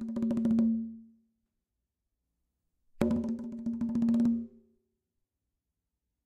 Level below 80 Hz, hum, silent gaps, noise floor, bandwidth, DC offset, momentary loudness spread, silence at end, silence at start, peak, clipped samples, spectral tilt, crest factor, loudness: -60 dBFS; none; none; -86 dBFS; 8.4 kHz; under 0.1%; 10 LU; 1.8 s; 0 s; -12 dBFS; under 0.1%; -8.5 dB/octave; 22 dB; -31 LUFS